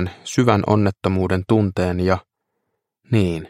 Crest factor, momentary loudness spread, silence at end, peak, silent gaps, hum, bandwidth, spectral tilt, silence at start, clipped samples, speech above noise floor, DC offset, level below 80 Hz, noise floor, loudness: 20 dB; 5 LU; 0 s; 0 dBFS; none; none; 12 kHz; -7 dB/octave; 0 s; under 0.1%; 57 dB; under 0.1%; -46 dBFS; -76 dBFS; -19 LUFS